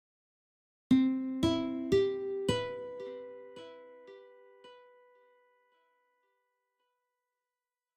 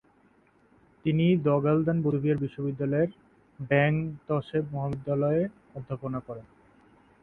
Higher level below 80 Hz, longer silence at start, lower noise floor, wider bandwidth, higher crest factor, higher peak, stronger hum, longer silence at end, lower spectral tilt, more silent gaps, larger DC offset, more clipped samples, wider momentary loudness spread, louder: about the same, -60 dBFS vs -60 dBFS; second, 0.9 s vs 1.05 s; first, under -90 dBFS vs -63 dBFS; first, 10.5 kHz vs 4.1 kHz; about the same, 22 dB vs 20 dB; second, -14 dBFS vs -8 dBFS; neither; first, 3.2 s vs 0.8 s; second, -6 dB/octave vs -10.5 dB/octave; neither; neither; neither; first, 24 LU vs 13 LU; second, -32 LUFS vs -28 LUFS